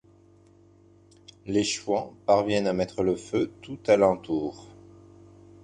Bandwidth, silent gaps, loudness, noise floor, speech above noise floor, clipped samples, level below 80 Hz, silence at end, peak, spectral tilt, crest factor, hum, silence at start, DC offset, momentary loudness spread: 10 kHz; none; -26 LUFS; -56 dBFS; 31 dB; under 0.1%; -58 dBFS; 1 s; -6 dBFS; -5 dB/octave; 22 dB; none; 1.45 s; under 0.1%; 12 LU